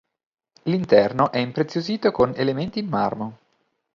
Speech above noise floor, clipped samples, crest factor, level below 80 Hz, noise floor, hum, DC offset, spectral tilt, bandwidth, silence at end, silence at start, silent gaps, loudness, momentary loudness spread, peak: 48 dB; under 0.1%; 20 dB; -56 dBFS; -70 dBFS; none; under 0.1%; -7.5 dB/octave; 7.2 kHz; 0.6 s; 0.65 s; none; -22 LUFS; 10 LU; -2 dBFS